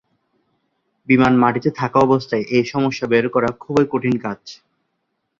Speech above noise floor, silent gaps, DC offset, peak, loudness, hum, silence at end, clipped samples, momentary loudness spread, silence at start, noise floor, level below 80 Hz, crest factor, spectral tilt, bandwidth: 56 dB; none; under 0.1%; -2 dBFS; -18 LUFS; none; 0.85 s; under 0.1%; 8 LU; 1.1 s; -73 dBFS; -54 dBFS; 18 dB; -7 dB/octave; 7.4 kHz